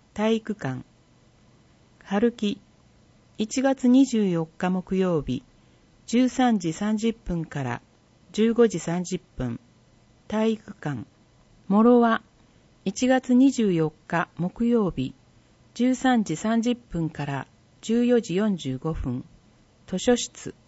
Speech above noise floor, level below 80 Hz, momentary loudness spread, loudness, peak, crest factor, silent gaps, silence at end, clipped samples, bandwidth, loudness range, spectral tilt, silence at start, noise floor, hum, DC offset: 34 dB; -50 dBFS; 14 LU; -25 LUFS; -8 dBFS; 16 dB; none; 0.15 s; under 0.1%; 8 kHz; 5 LU; -6 dB/octave; 0.15 s; -58 dBFS; none; under 0.1%